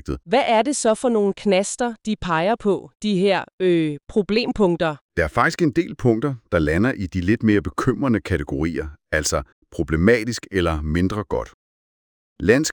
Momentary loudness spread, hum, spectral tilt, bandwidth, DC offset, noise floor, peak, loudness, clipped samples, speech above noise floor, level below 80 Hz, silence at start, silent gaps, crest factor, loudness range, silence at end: 7 LU; none; -5.5 dB/octave; over 20 kHz; under 0.1%; under -90 dBFS; -2 dBFS; -21 LUFS; under 0.1%; over 70 dB; -38 dBFS; 0.05 s; 2.95-3.00 s, 3.53-3.58 s, 5.01-5.09 s, 9.52-9.62 s, 11.54-12.36 s; 20 dB; 2 LU; 0 s